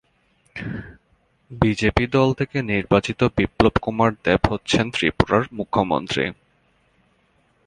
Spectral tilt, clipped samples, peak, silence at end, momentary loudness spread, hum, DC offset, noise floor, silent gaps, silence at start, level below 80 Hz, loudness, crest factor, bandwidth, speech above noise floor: -6 dB/octave; under 0.1%; 0 dBFS; 1.35 s; 11 LU; none; under 0.1%; -63 dBFS; none; 0.55 s; -38 dBFS; -21 LUFS; 22 dB; 10.5 kHz; 43 dB